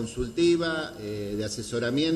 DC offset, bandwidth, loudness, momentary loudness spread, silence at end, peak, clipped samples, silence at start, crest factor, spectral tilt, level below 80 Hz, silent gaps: under 0.1%; 13.5 kHz; -28 LUFS; 10 LU; 0 s; -14 dBFS; under 0.1%; 0 s; 14 dB; -5 dB/octave; -48 dBFS; none